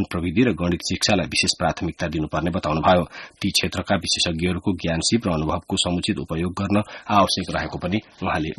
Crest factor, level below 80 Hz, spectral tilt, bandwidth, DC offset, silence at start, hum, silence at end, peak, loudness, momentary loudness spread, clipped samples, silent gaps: 18 dB; -42 dBFS; -4.5 dB/octave; 12 kHz; under 0.1%; 0 s; none; 0.05 s; -4 dBFS; -22 LUFS; 7 LU; under 0.1%; none